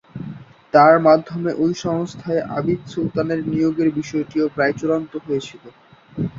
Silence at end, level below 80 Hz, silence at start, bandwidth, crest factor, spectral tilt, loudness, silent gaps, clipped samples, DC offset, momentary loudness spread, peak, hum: 0 s; -54 dBFS; 0.15 s; 7.6 kHz; 18 dB; -7 dB/octave; -19 LUFS; none; under 0.1%; under 0.1%; 13 LU; -2 dBFS; none